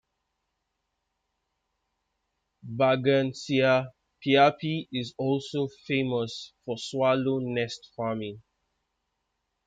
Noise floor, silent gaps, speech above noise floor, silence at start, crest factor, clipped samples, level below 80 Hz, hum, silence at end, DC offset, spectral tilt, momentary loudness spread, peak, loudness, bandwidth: -81 dBFS; none; 54 dB; 2.65 s; 20 dB; under 0.1%; -70 dBFS; none; 1.25 s; under 0.1%; -6 dB/octave; 13 LU; -10 dBFS; -27 LUFS; 9.2 kHz